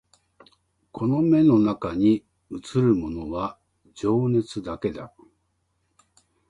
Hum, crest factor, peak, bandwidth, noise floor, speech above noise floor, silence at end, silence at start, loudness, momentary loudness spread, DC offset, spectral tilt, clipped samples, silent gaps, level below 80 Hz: none; 16 dB; -8 dBFS; 10.5 kHz; -72 dBFS; 50 dB; 1.4 s; 0.95 s; -23 LUFS; 19 LU; under 0.1%; -8.5 dB/octave; under 0.1%; none; -52 dBFS